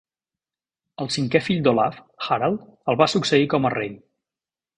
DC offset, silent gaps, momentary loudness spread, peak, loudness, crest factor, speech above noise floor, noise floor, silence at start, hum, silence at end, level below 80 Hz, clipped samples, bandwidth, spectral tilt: under 0.1%; none; 9 LU; 0 dBFS; -21 LUFS; 22 dB; over 69 dB; under -90 dBFS; 1 s; none; 0.8 s; -58 dBFS; under 0.1%; 10.5 kHz; -5.5 dB/octave